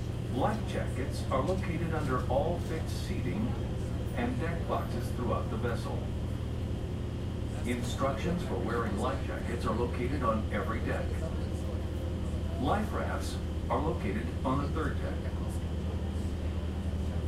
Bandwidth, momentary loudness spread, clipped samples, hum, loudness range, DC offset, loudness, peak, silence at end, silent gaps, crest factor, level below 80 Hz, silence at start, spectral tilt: 14 kHz; 5 LU; under 0.1%; none; 2 LU; under 0.1%; -33 LUFS; -16 dBFS; 0 s; none; 16 dB; -38 dBFS; 0 s; -7 dB/octave